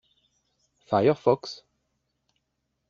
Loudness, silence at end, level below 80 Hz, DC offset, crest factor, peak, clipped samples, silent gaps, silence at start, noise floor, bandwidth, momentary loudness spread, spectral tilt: -24 LUFS; 1.35 s; -68 dBFS; under 0.1%; 22 dB; -6 dBFS; under 0.1%; none; 0.9 s; -79 dBFS; 7.4 kHz; 18 LU; -5.5 dB/octave